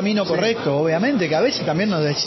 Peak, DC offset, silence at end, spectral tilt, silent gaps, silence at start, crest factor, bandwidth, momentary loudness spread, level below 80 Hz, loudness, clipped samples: -8 dBFS; under 0.1%; 0 s; -5.5 dB/octave; none; 0 s; 12 dB; 6.2 kHz; 1 LU; -58 dBFS; -19 LUFS; under 0.1%